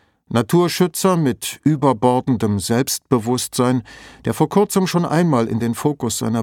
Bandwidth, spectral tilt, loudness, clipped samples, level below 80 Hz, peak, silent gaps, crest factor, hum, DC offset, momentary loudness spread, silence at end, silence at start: 18.5 kHz; -5.5 dB/octave; -18 LUFS; under 0.1%; -52 dBFS; -2 dBFS; none; 16 dB; none; under 0.1%; 5 LU; 0 s; 0.3 s